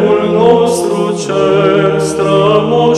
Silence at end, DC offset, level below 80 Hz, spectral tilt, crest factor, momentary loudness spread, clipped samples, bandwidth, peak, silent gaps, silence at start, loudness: 0 s; under 0.1%; -44 dBFS; -5.5 dB/octave; 10 dB; 5 LU; 0.1%; 13.5 kHz; 0 dBFS; none; 0 s; -11 LUFS